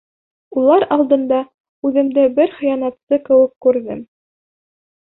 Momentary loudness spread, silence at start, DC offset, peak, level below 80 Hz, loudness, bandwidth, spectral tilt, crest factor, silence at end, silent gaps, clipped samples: 11 LU; 0.55 s; under 0.1%; -2 dBFS; -60 dBFS; -16 LUFS; 4.1 kHz; -10.5 dB/octave; 14 dB; 1 s; 1.54-1.82 s, 3.03-3.07 s, 3.56-3.61 s; under 0.1%